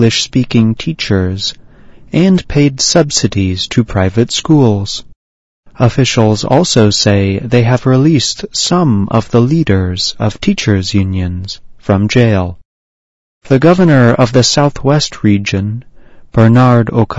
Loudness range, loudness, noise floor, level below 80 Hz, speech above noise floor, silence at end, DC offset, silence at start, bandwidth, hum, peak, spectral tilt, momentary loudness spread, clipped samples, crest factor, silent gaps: 3 LU; -11 LUFS; -36 dBFS; -36 dBFS; 26 dB; 0 s; under 0.1%; 0 s; 8 kHz; none; 0 dBFS; -5.5 dB/octave; 9 LU; 0.5%; 10 dB; 5.16-5.63 s, 12.65-13.41 s